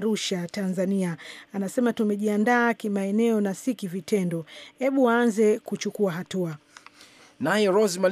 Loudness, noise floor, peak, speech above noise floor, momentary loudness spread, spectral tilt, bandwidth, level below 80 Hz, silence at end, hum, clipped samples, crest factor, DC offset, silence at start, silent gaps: -25 LUFS; -53 dBFS; -8 dBFS; 28 dB; 11 LU; -5.5 dB/octave; 15.5 kHz; -76 dBFS; 0 s; none; under 0.1%; 16 dB; under 0.1%; 0 s; none